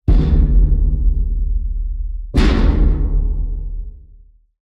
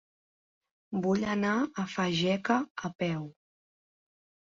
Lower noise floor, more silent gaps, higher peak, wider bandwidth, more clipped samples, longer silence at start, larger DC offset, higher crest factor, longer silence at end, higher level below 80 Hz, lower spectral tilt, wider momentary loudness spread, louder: second, -45 dBFS vs under -90 dBFS; second, none vs 2.71-2.75 s, 2.95-2.99 s; first, -4 dBFS vs -12 dBFS; second, 6 kHz vs 7.6 kHz; neither; second, 0.05 s vs 0.9 s; neither; second, 12 dB vs 20 dB; second, 0.65 s vs 1.2 s; first, -16 dBFS vs -68 dBFS; first, -8 dB/octave vs -5.5 dB/octave; first, 13 LU vs 9 LU; first, -19 LUFS vs -30 LUFS